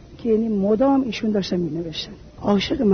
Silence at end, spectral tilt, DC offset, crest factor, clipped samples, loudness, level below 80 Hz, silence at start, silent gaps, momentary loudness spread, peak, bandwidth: 0 s; -6.5 dB/octave; under 0.1%; 14 dB; under 0.1%; -21 LUFS; -46 dBFS; 0 s; none; 11 LU; -6 dBFS; 6.6 kHz